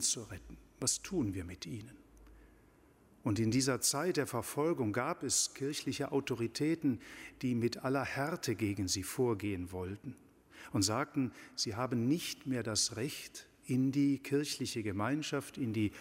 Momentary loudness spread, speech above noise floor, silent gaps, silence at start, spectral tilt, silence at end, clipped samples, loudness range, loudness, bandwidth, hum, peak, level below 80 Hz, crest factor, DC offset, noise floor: 12 LU; 29 dB; none; 0 s; -4 dB/octave; 0 s; under 0.1%; 3 LU; -35 LUFS; 16 kHz; none; -18 dBFS; -64 dBFS; 18 dB; under 0.1%; -64 dBFS